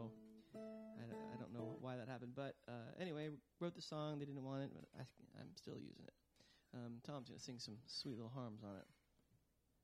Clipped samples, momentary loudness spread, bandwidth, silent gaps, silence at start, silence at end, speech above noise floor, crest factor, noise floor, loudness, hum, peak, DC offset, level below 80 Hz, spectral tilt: under 0.1%; 11 LU; 14.5 kHz; none; 0 s; 0.45 s; 28 dB; 18 dB; -80 dBFS; -53 LUFS; none; -34 dBFS; under 0.1%; -84 dBFS; -6 dB/octave